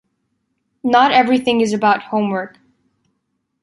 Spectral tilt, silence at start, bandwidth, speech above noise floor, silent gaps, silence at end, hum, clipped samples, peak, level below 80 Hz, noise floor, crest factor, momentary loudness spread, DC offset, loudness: -5 dB/octave; 0.85 s; 11.5 kHz; 56 dB; none; 1.15 s; none; under 0.1%; -2 dBFS; -62 dBFS; -71 dBFS; 16 dB; 13 LU; under 0.1%; -16 LUFS